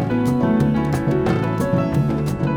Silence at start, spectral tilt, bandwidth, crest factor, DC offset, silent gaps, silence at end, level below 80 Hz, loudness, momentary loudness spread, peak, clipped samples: 0 s; -8 dB/octave; 16 kHz; 12 dB; under 0.1%; none; 0 s; -38 dBFS; -19 LUFS; 3 LU; -6 dBFS; under 0.1%